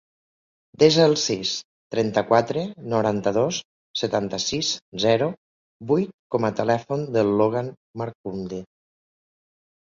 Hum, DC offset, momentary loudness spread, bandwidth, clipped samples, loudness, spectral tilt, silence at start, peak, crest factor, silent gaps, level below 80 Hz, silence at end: none; under 0.1%; 13 LU; 7.6 kHz; under 0.1%; -23 LUFS; -4.5 dB/octave; 0.8 s; -4 dBFS; 20 dB; 1.65-1.90 s, 3.65-3.94 s, 4.82-4.92 s, 5.37-5.80 s, 6.14-6.30 s, 7.77-7.94 s, 8.15-8.24 s; -60 dBFS; 1.25 s